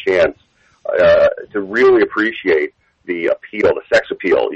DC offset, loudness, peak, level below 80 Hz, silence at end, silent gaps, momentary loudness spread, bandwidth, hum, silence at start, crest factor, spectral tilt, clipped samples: under 0.1%; -15 LUFS; -4 dBFS; -48 dBFS; 0 s; none; 11 LU; 8.2 kHz; none; 0 s; 12 dB; -5.5 dB/octave; under 0.1%